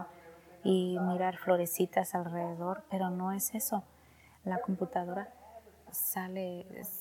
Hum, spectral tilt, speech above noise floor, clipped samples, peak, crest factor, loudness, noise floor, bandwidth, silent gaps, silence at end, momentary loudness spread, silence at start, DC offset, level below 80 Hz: none; -5 dB/octave; 27 dB; under 0.1%; -14 dBFS; 20 dB; -34 LUFS; -61 dBFS; 18.5 kHz; none; 0 s; 11 LU; 0 s; under 0.1%; -72 dBFS